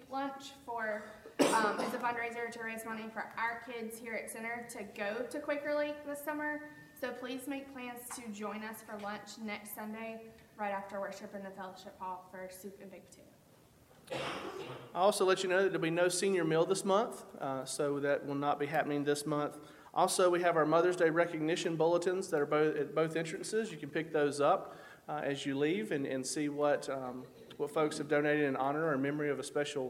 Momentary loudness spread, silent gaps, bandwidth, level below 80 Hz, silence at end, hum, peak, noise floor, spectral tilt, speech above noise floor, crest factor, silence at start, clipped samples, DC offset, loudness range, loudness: 15 LU; none; 16.5 kHz; -76 dBFS; 0 s; none; -14 dBFS; -63 dBFS; -4.5 dB/octave; 28 dB; 22 dB; 0 s; under 0.1%; under 0.1%; 12 LU; -35 LUFS